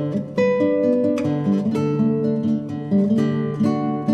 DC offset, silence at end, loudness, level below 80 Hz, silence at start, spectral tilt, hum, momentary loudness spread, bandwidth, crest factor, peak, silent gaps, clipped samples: under 0.1%; 0 s; -20 LUFS; -62 dBFS; 0 s; -9 dB/octave; none; 4 LU; 8.6 kHz; 12 dB; -6 dBFS; none; under 0.1%